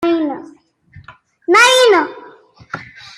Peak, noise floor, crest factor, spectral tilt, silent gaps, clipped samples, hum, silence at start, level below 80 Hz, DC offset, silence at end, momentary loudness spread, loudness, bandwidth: 0 dBFS; -44 dBFS; 16 dB; -2 dB/octave; none; under 0.1%; none; 0 s; -60 dBFS; under 0.1%; 0.35 s; 22 LU; -11 LUFS; 15 kHz